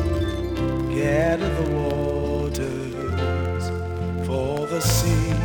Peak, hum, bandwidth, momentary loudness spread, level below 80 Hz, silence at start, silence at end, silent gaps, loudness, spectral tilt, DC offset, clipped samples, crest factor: -6 dBFS; none; over 20 kHz; 7 LU; -34 dBFS; 0 s; 0 s; none; -24 LUFS; -6 dB/octave; under 0.1%; under 0.1%; 18 dB